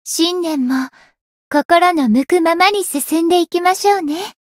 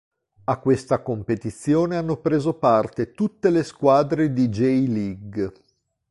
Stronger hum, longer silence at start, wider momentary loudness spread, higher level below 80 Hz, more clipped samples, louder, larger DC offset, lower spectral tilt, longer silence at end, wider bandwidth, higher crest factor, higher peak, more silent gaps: neither; second, 0.05 s vs 0.5 s; second, 7 LU vs 10 LU; second, -60 dBFS vs -52 dBFS; neither; first, -15 LUFS vs -22 LUFS; neither; second, -3 dB/octave vs -7.5 dB/octave; second, 0.15 s vs 0.6 s; first, 16.5 kHz vs 11.5 kHz; about the same, 16 dB vs 18 dB; first, 0 dBFS vs -4 dBFS; first, 1.21-1.51 s, 1.65-1.69 s vs none